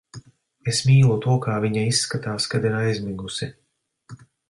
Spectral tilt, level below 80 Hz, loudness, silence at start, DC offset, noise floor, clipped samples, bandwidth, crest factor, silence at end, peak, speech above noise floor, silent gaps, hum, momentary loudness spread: -5 dB/octave; -54 dBFS; -22 LUFS; 0.15 s; under 0.1%; -52 dBFS; under 0.1%; 11.5 kHz; 16 dB; 0.35 s; -6 dBFS; 32 dB; none; none; 13 LU